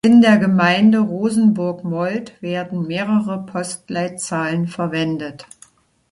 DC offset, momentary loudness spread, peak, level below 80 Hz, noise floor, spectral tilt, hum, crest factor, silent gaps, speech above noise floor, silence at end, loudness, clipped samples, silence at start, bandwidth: under 0.1%; 12 LU; -2 dBFS; -58 dBFS; -51 dBFS; -6 dB/octave; none; 16 dB; none; 34 dB; 0.7 s; -18 LUFS; under 0.1%; 0.05 s; 11.5 kHz